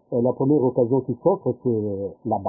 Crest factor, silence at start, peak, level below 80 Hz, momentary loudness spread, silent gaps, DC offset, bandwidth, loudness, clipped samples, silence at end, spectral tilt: 16 dB; 0.1 s; -6 dBFS; -56 dBFS; 7 LU; none; under 0.1%; 1.2 kHz; -22 LUFS; under 0.1%; 0 s; -18 dB/octave